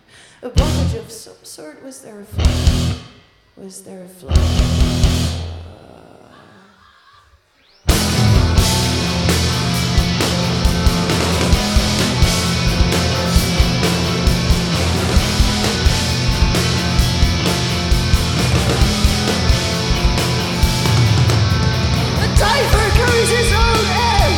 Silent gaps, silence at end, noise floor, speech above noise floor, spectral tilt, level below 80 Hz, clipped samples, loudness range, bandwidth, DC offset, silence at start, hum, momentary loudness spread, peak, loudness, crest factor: none; 0 s; -53 dBFS; 36 dB; -4.5 dB/octave; -20 dBFS; under 0.1%; 6 LU; 17 kHz; under 0.1%; 0.4 s; none; 14 LU; 0 dBFS; -16 LUFS; 16 dB